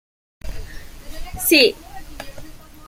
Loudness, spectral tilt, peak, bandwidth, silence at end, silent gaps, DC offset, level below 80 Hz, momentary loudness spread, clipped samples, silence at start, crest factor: -15 LUFS; -2.5 dB/octave; -2 dBFS; 16.5 kHz; 0 s; none; under 0.1%; -36 dBFS; 26 LU; under 0.1%; 0.45 s; 22 dB